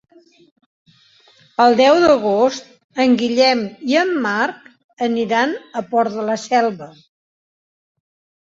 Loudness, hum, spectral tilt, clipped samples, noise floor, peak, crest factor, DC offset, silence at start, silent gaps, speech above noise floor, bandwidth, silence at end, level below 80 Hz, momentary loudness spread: -16 LUFS; none; -4 dB/octave; under 0.1%; -52 dBFS; -2 dBFS; 16 dB; under 0.1%; 1.6 s; 2.84-2.89 s, 4.84-4.97 s; 36 dB; 7.8 kHz; 1.6 s; -60 dBFS; 11 LU